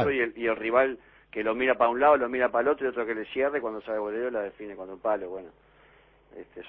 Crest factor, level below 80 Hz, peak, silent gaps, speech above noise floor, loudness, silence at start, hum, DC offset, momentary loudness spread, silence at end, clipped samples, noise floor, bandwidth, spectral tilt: 20 dB; -60 dBFS; -8 dBFS; none; 32 dB; -27 LUFS; 0 s; none; under 0.1%; 17 LU; 0 s; under 0.1%; -59 dBFS; 4.9 kHz; -8.5 dB/octave